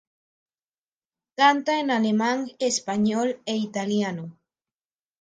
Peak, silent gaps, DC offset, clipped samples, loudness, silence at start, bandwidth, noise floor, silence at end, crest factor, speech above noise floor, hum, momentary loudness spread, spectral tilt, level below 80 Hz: -6 dBFS; none; under 0.1%; under 0.1%; -24 LUFS; 1.4 s; 9.6 kHz; under -90 dBFS; 0.9 s; 20 dB; over 67 dB; none; 10 LU; -4 dB/octave; -72 dBFS